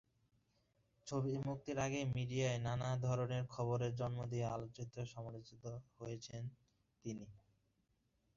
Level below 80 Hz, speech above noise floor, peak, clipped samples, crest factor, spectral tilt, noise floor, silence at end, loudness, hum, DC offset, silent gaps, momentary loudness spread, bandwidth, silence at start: -68 dBFS; 39 dB; -28 dBFS; under 0.1%; 16 dB; -6.5 dB/octave; -81 dBFS; 1 s; -43 LUFS; none; under 0.1%; none; 13 LU; 7.4 kHz; 1.05 s